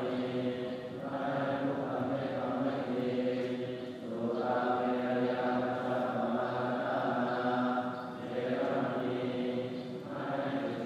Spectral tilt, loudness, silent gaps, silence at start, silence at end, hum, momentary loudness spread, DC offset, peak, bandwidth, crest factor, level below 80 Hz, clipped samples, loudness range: -7.5 dB/octave; -34 LUFS; none; 0 s; 0 s; none; 7 LU; under 0.1%; -18 dBFS; 9.4 kHz; 16 dB; -74 dBFS; under 0.1%; 2 LU